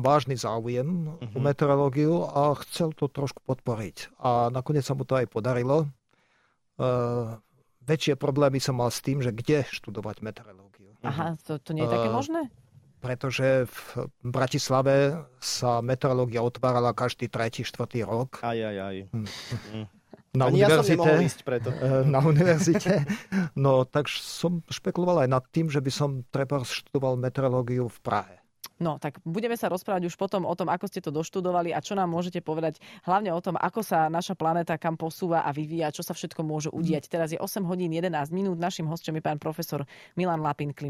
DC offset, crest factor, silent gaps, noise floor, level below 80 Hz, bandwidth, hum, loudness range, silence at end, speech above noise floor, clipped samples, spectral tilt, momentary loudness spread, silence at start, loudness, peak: under 0.1%; 20 dB; none; -69 dBFS; -60 dBFS; 15.5 kHz; none; 6 LU; 0 s; 42 dB; under 0.1%; -6 dB/octave; 11 LU; 0 s; -27 LUFS; -8 dBFS